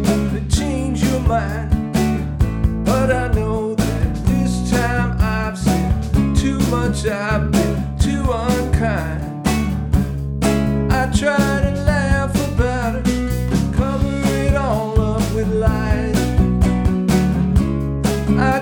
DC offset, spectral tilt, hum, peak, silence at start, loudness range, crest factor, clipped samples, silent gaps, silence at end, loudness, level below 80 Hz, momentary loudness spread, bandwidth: under 0.1%; -6.5 dB/octave; none; -2 dBFS; 0 s; 1 LU; 14 dB; under 0.1%; none; 0 s; -18 LUFS; -24 dBFS; 4 LU; 19 kHz